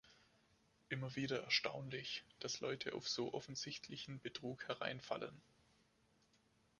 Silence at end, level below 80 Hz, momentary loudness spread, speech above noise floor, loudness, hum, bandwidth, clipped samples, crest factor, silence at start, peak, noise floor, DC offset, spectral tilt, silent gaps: 1.4 s; -80 dBFS; 11 LU; 31 dB; -44 LUFS; none; 11 kHz; under 0.1%; 24 dB; 0.05 s; -24 dBFS; -77 dBFS; under 0.1%; -3.5 dB/octave; none